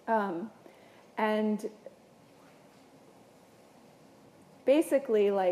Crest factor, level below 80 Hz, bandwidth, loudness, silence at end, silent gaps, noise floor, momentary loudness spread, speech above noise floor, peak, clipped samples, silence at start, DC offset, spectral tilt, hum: 18 dB; -84 dBFS; 15 kHz; -30 LUFS; 0 s; none; -58 dBFS; 17 LU; 30 dB; -14 dBFS; under 0.1%; 0.05 s; under 0.1%; -6 dB/octave; none